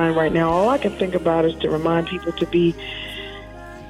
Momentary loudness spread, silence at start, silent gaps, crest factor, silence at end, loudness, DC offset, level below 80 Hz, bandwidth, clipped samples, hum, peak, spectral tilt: 14 LU; 0 s; none; 14 dB; 0 s; -20 LUFS; under 0.1%; -42 dBFS; 12 kHz; under 0.1%; none; -8 dBFS; -7 dB/octave